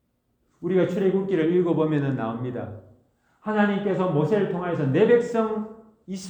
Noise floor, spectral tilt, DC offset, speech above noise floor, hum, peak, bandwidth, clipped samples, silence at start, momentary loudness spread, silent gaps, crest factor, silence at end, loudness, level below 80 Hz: -70 dBFS; -8 dB/octave; under 0.1%; 48 dB; none; -8 dBFS; 19.5 kHz; under 0.1%; 0.6 s; 15 LU; none; 16 dB; 0 s; -23 LUFS; -64 dBFS